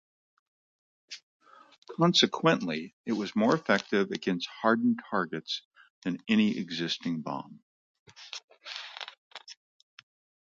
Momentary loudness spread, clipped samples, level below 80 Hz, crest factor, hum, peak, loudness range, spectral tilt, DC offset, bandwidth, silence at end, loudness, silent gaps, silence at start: 21 LU; under 0.1%; -76 dBFS; 22 dB; none; -8 dBFS; 10 LU; -5 dB/octave; under 0.1%; 7.6 kHz; 0.95 s; -29 LUFS; 1.23-1.40 s, 1.78-1.82 s, 2.93-3.04 s, 5.65-5.71 s, 5.90-6.02 s, 7.62-8.06 s, 8.44-8.48 s, 9.18-9.31 s; 1.1 s